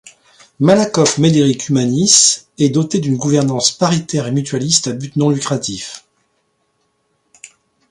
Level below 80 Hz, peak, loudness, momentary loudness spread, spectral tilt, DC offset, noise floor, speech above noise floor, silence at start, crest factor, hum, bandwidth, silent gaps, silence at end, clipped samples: -54 dBFS; 0 dBFS; -14 LUFS; 10 LU; -4 dB/octave; under 0.1%; -65 dBFS; 50 dB; 0.6 s; 16 dB; none; 11.5 kHz; none; 1.9 s; under 0.1%